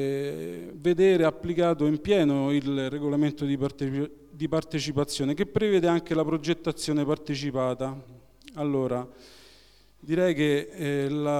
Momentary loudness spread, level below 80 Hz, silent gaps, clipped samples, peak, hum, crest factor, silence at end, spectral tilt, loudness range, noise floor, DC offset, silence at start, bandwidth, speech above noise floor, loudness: 10 LU; -56 dBFS; none; under 0.1%; -10 dBFS; none; 16 dB; 0 s; -6.5 dB/octave; 5 LU; -58 dBFS; under 0.1%; 0 s; 13.5 kHz; 32 dB; -27 LUFS